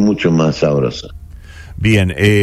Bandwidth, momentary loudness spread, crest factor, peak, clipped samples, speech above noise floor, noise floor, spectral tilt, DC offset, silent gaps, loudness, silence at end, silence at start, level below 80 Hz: 14.5 kHz; 18 LU; 14 dB; 0 dBFS; under 0.1%; 21 dB; -34 dBFS; -6.5 dB/octave; under 0.1%; none; -14 LUFS; 0 s; 0 s; -34 dBFS